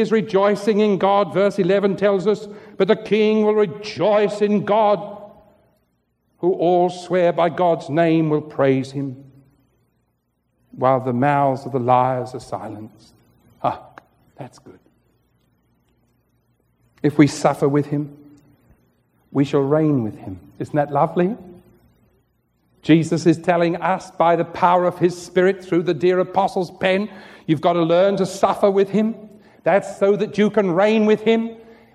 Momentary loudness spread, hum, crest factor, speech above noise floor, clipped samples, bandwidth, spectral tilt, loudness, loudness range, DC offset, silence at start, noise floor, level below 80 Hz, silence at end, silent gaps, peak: 13 LU; none; 18 dB; 51 dB; under 0.1%; 12.5 kHz; -7 dB/octave; -19 LUFS; 6 LU; under 0.1%; 0 s; -69 dBFS; -62 dBFS; 0.35 s; none; 0 dBFS